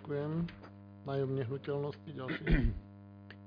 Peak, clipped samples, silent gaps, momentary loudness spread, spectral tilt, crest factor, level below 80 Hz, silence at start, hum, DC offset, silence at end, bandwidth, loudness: -16 dBFS; under 0.1%; none; 20 LU; -7 dB/octave; 20 dB; -42 dBFS; 0 s; 50 Hz at -55 dBFS; under 0.1%; 0 s; 5.2 kHz; -37 LUFS